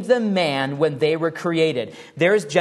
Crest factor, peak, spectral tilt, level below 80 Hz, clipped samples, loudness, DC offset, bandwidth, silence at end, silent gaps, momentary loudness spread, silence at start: 18 dB; -2 dBFS; -5.5 dB/octave; -68 dBFS; under 0.1%; -20 LUFS; under 0.1%; 12 kHz; 0 s; none; 4 LU; 0 s